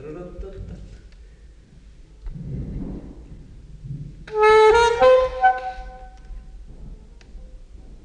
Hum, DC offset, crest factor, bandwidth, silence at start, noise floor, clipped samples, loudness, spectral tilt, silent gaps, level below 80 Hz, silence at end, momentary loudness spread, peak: none; under 0.1%; 18 dB; 10 kHz; 0 s; -46 dBFS; under 0.1%; -17 LUFS; -4.5 dB/octave; none; -38 dBFS; 0.1 s; 27 LU; -4 dBFS